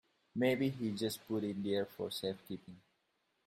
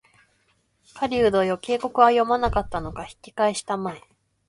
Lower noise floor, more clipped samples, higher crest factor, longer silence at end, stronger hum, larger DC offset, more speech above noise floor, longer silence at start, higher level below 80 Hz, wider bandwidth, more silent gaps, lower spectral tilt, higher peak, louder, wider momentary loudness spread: first, -81 dBFS vs -67 dBFS; neither; about the same, 20 dB vs 22 dB; first, 0.65 s vs 0.5 s; neither; neither; about the same, 43 dB vs 44 dB; second, 0.35 s vs 0.95 s; second, -76 dBFS vs -44 dBFS; first, 16 kHz vs 11.5 kHz; neither; about the same, -5.5 dB/octave vs -5 dB/octave; second, -18 dBFS vs -2 dBFS; second, -38 LUFS vs -22 LUFS; second, 13 LU vs 17 LU